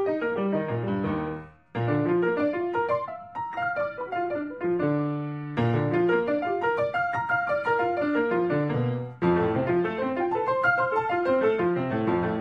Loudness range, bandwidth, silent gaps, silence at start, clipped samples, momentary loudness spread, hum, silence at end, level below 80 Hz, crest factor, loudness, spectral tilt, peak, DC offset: 3 LU; 6 kHz; none; 0 s; under 0.1%; 7 LU; none; 0 s; -58 dBFS; 14 dB; -26 LUFS; -9 dB/octave; -12 dBFS; under 0.1%